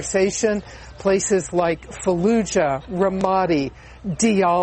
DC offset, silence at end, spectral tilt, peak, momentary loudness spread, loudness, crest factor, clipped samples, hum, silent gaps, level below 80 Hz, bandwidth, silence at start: under 0.1%; 0 s; -5 dB/octave; -6 dBFS; 9 LU; -21 LUFS; 14 dB; under 0.1%; none; none; -44 dBFS; 8.8 kHz; 0 s